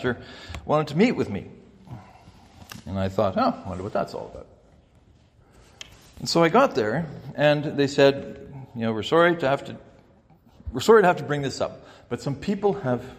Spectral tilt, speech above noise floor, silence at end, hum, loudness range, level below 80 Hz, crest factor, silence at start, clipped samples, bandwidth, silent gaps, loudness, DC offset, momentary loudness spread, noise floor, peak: -6 dB/octave; 33 dB; 0 s; none; 7 LU; -54 dBFS; 20 dB; 0 s; under 0.1%; 15.5 kHz; none; -23 LUFS; under 0.1%; 24 LU; -56 dBFS; -4 dBFS